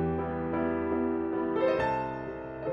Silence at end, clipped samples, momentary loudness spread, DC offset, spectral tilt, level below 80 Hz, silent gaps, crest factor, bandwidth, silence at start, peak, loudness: 0 s; under 0.1%; 9 LU; under 0.1%; -9 dB/octave; -50 dBFS; none; 14 dB; 6.8 kHz; 0 s; -16 dBFS; -30 LUFS